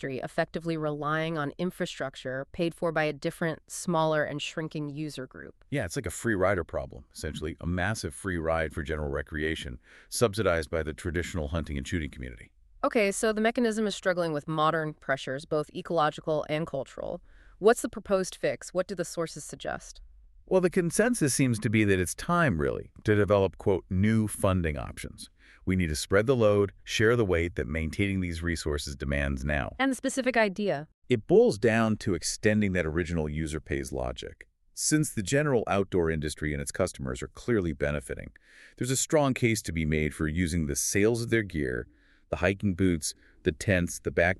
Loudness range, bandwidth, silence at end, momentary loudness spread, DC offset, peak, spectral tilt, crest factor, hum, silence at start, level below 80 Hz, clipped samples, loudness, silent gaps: 5 LU; 13.5 kHz; 0 s; 11 LU; under 0.1%; -10 dBFS; -5 dB/octave; 20 dB; none; 0 s; -44 dBFS; under 0.1%; -29 LUFS; 30.94-31.02 s